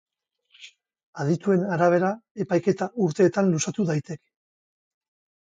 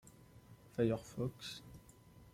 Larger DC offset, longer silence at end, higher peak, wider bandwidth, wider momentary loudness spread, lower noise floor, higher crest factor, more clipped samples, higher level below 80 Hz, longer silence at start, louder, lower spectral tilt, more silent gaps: neither; first, 1.25 s vs 0.05 s; first, -8 dBFS vs -22 dBFS; second, 9.4 kHz vs 16.5 kHz; second, 11 LU vs 25 LU; about the same, -64 dBFS vs -61 dBFS; about the same, 18 dB vs 22 dB; neither; about the same, -70 dBFS vs -66 dBFS; first, 0.6 s vs 0.05 s; first, -24 LUFS vs -41 LUFS; about the same, -6.5 dB/octave vs -6.5 dB/octave; first, 1.03-1.13 s, 2.31-2.35 s vs none